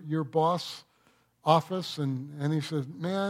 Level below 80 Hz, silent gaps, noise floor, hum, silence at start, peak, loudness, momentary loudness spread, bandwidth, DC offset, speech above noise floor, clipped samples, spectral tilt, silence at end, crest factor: -76 dBFS; none; -66 dBFS; none; 0 s; -8 dBFS; -30 LUFS; 9 LU; 15 kHz; under 0.1%; 38 dB; under 0.1%; -6.5 dB/octave; 0 s; 22 dB